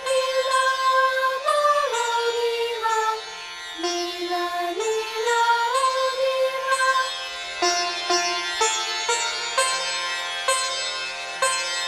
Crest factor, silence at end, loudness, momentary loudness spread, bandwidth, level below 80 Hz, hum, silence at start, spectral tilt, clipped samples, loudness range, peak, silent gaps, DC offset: 14 dB; 0 s; -22 LUFS; 7 LU; 15.5 kHz; -64 dBFS; none; 0 s; 0.5 dB/octave; under 0.1%; 3 LU; -8 dBFS; none; under 0.1%